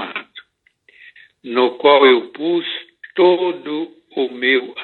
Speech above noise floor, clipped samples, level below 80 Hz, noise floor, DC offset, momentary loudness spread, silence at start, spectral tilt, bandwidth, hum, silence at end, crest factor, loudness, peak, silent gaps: 41 dB; under 0.1%; -78 dBFS; -57 dBFS; under 0.1%; 16 LU; 0 s; -7 dB/octave; 4.3 kHz; none; 0 s; 18 dB; -16 LUFS; 0 dBFS; none